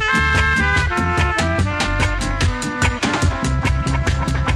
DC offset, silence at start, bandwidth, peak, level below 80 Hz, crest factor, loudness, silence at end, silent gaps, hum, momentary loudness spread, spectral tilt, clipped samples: under 0.1%; 0 s; 12.5 kHz; -4 dBFS; -24 dBFS; 14 dB; -18 LUFS; 0 s; none; none; 5 LU; -4.5 dB/octave; under 0.1%